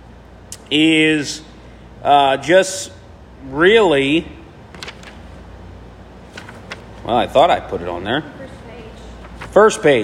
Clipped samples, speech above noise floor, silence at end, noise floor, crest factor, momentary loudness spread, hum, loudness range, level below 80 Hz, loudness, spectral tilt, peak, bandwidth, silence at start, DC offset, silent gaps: under 0.1%; 26 dB; 0 s; -40 dBFS; 18 dB; 24 LU; none; 6 LU; -42 dBFS; -15 LUFS; -4 dB/octave; 0 dBFS; 15 kHz; 0.5 s; under 0.1%; none